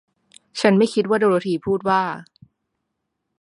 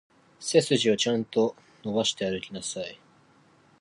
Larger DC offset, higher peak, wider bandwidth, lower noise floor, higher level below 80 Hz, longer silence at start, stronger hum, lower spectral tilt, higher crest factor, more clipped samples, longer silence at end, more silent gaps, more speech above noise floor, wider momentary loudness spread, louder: neither; first, -2 dBFS vs -8 dBFS; about the same, 11 kHz vs 11.5 kHz; first, -77 dBFS vs -60 dBFS; about the same, -62 dBFS vs -66 dBFS; first, 0.55 s vs 0.4 s; neither; first, -6 dB/octave vs -4 dB/octave; about the same, 20 dB vs 22 dB; neither; first, 1.2 s vs 0.85 s; neither; first, 59 dB vs 34 dB; second, 11 LU vs 14 LU; first, -19 LUFS vs -27 LUFS